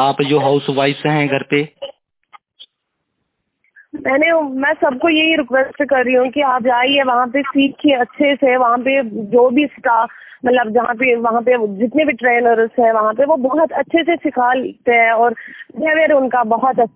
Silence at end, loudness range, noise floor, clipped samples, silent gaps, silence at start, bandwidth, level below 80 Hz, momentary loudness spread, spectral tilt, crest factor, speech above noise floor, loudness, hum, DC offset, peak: 0.05 s; 5 LU; -73 dBFS; under 0.1%; none; 0 s; 4 kHz; -58 dBFS; 5 LU; -9 dB/octave; 14 dB; 59 dB; -15 LUFS; none; under 0.1%; -2 dBFS